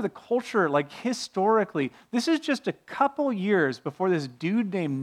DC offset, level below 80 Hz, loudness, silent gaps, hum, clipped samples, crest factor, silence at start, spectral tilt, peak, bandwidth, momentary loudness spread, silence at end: under 0.1%; -76 dBFS; -26 LUFS; none; none; under 0.1%; 16 dB; 0 s; -5.5 dB/octave; -10 dBFS; 14 kHz; 6 LU; 0 s